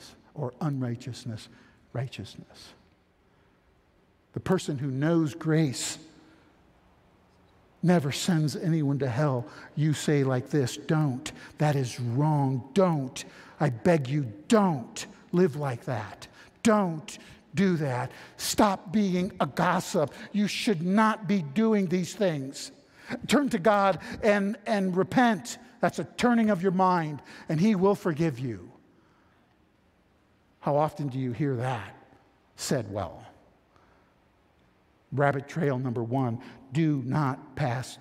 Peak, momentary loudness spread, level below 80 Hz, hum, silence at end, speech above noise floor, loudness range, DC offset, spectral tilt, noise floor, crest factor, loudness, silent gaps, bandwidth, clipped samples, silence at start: -6 dBFS; 14 LU; -62 dBFS; none; 0.05 s; 38 dB; 8 LU; under 0.1%; -6 dB/octave; -65 dBFS; 22 dB; -27 LUFS; none; 15.5 kHz; under 0.1%; 0 s